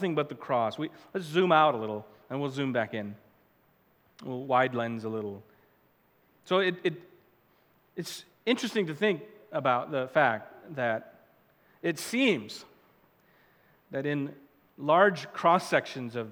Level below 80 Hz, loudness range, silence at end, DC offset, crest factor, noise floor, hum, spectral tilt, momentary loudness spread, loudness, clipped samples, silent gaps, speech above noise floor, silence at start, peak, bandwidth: -80 dBFS; 5 LU; 0 s; under 0.1%; 22 dB; -66 dBFS; none; -5 dB/octave; 16 LU; -29 LUFS; under 0.1%; none; 38 dB; 0 s; -8 dBFS; 20 kHz